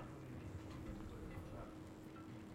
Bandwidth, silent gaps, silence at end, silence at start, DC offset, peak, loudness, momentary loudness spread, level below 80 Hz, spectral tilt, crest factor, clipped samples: 16 kHz; none; 0 s; 0 s; under 0.1%; -38 dBFS; -53 LUFS; 3 LU; -60 dBFS; -7 dB/octave; 14 dB; under 0.1%